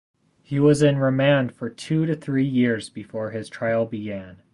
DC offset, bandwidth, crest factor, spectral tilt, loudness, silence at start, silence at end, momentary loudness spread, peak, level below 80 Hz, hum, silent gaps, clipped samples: under 0.1%; 11.5 kHz; 16 dB; -7 dB/octave; -22 LUFS; 0.5 s; 0.2 s; 13 LU; -6 dBFS; -56 dBFS; none; none; under 0.1%